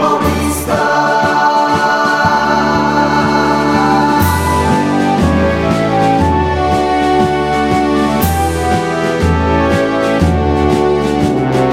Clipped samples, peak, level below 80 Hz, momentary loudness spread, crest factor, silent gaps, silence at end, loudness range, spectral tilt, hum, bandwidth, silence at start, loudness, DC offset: under 0.1%; 0 dBFS; -30 dBFS; 3 LU; 12 dB; none; 0 s; 1 LU; -6 dB/octave; none; 16.5 kHz; 0 s; -12 LUFS; under 0.1%